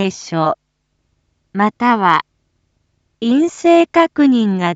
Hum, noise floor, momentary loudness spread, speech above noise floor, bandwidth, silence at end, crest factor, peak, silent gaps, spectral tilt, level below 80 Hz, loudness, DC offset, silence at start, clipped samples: none; -67 dBFS; 8 LU; 53 dB; 8 kHz; 0 s; 16 dB; 0 dBFS; none; -6 dB/octave; -62 dBFS; -14 LUFS; under 0.1%; 0 s; under 0.1%